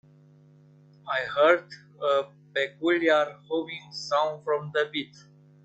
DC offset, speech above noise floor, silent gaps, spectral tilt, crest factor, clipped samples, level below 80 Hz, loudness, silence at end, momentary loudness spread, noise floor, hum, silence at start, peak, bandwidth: under 0.1%; 29 dB; none; -4.5 dB/octave; 20 dB; under 0.1%; -76 dBFS; -26 LUFS; 0.6 s; 13 LU; -55 dBFS; none; 1.05 s; -8 dBFS; 8.2 kHz